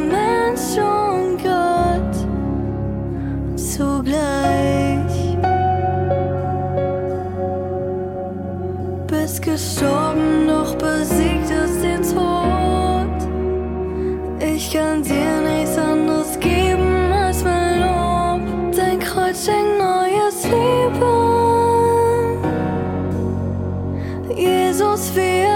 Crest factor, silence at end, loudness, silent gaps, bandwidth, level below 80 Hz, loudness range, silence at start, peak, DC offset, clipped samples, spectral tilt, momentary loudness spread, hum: 14 dB; 0 s; -19 LUFS; none; 17.5 kHz; -32 dBFS; 4 LU; 0 s; -4 dBFS; under 0.1%; under 0.1%; -5.5 dB/octave; 7 LU; none